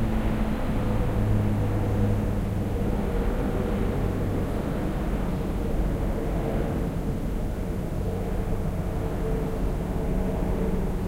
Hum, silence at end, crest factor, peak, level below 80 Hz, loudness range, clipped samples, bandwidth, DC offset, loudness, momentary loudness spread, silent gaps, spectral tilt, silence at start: none; 0 s; 14 dB; -12 dBFS; -30 dBFS; 3 LU; under 0.1%; 16 kHz; under 0.1%; -28 LUFS; 4 LU; none; -8 dB/octave; 0 s